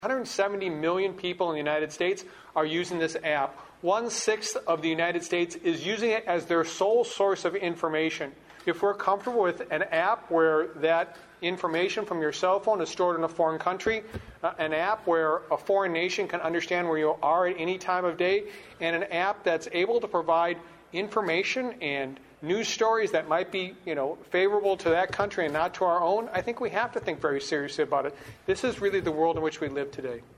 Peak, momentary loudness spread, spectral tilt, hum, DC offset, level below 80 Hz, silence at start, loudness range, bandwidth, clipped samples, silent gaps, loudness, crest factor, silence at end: -10 dBFS; 7 LU; -4 dB/octave; none; under 0.1%; -62 dBFS; 0 s; 2 LU; 14 kHz; under 0.1%; none; -28 LUFS; 18 dB; 0.15 s